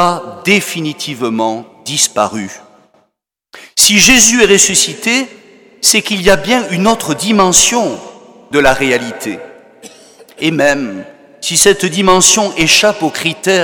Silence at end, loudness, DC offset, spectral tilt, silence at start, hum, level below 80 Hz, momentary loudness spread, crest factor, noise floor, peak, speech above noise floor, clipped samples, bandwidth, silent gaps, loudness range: 0 s; -10 LUFS; under 0.1%; -2 dB/octave; 0 s; none; -40 dBFS; 15 LU; 12 dB; -66 dBFS; 0 dBFS; 54 dB; 0.3%; over 20 kHz; none; 7 LU